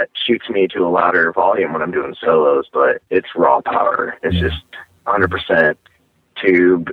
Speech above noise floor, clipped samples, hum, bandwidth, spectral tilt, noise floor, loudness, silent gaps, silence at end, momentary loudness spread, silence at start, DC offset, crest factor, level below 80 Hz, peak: 41 dB; under 0.1%; none; 5 kHz; -8 dB/octave; -56 dBFS; -16 LUFS; none; 0 s; 7 LU; 0 s; under 0.1%; 16 dB; -40 dBFS; 0 dBFS